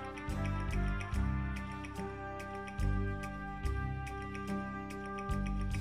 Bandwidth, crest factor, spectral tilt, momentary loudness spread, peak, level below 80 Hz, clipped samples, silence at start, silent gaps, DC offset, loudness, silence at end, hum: 14 kHz; 14 dB; -7 dB/octave; 6 LU; -22 dBFS; -40 dBFS; under 0.1%; 0 s; none; 0.1%; -39 LUFS; 0 s; 50 Hz at -50 dBFS